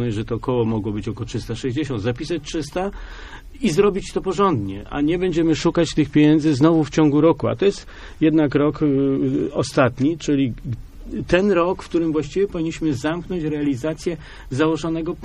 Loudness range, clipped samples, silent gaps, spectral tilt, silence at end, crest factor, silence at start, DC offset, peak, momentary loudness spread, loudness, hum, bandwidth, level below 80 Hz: 6 LU; under 0.1%; none; -6.5 dB/octave; 0 s; 18 dB; 0 s; under 0.1%; -2 dBFS; 12 LU; -20 LUFS; none; 11 kHz; -40 dBFS